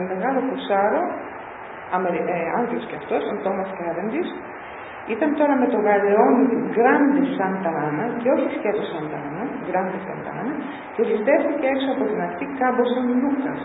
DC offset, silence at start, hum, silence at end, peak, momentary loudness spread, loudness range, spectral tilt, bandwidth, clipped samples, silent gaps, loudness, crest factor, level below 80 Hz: under 0.1%; 0 s; none; 0 s; -4 dBFS; 12 LU; 6 LU; -11 dB/octave; 4 kHz; under 0.1%; none; -22 LUFS; 18 dB; -62 dBFS